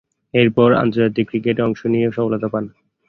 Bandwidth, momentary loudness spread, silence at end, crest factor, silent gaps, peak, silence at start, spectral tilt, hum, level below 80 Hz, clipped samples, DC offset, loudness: 6.2 kHz; 9 LU; 0.4 s; 16 dB; none; -2 dBFS; 0.35 s; -9 dB/octave; none; -52 dBFS; under 0.1%; under 0.1%; -18 LUFS